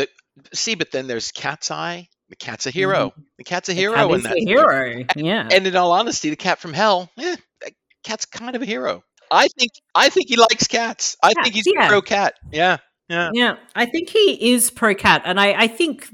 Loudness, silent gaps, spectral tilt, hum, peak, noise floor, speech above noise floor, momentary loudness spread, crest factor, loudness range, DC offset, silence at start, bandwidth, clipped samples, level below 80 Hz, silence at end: -18 LUFS; none; -2.5 dB/octave; none; 0 dBFS; -40 dBFS; 21 dB; 12 LU; 18 dB; 7 LU; under 0.1%; 0 s; 18 kHz; under 0.1%; -58 dBFS; 0.05 s